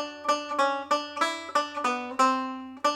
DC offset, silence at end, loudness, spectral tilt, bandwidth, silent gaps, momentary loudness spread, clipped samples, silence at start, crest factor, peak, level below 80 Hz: under 0.1%; 0 s; -27 LUFS; -1.5 dB/octave; 16 kHz; none; 5 LU; under 0.1%; 0 s; 18 dB; -10 dBFS; -76 dBFS